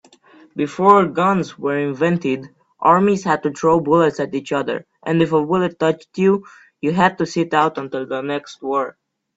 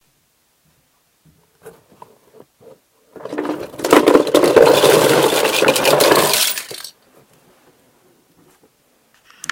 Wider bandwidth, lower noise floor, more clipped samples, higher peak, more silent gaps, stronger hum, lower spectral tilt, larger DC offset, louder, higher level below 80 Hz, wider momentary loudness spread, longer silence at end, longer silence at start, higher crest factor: second, 8 kHz vs 17.5 kHz; second, -49 dBFS vs -61 dBFS; neither; about the same, 0 dBFS vs 0 dBFS; neither; neither; first, -6.5 dB/octave vs -3 dB/octave; neither; second, -18 LUFS vs -13 LUFS; about the same, -58 dBFS vs -56 dBFS; second, 11 LU vs 19 LU; second, 0.45 s vs 2.65 s; second, 0.55 s vs 1.65 s; about the same, 18 dB vs 18 dB